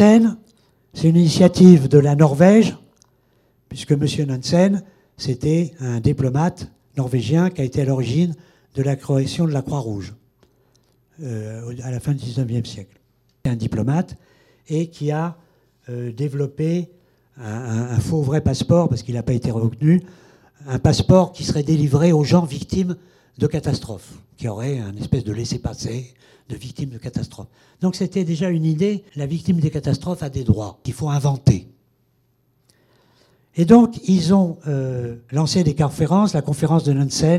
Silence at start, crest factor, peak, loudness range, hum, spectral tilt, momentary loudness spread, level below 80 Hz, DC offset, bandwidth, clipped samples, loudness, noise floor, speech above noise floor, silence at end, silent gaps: 0 s; 18 dB; 0 dBFS; 10 LU; none; -7 dB/octave; 16 LU; -46 dBFS; under 0.1%; 12 kHz; under 0.1%; -19 LUFS; -63 dBFS; 45 dB; 0 s; none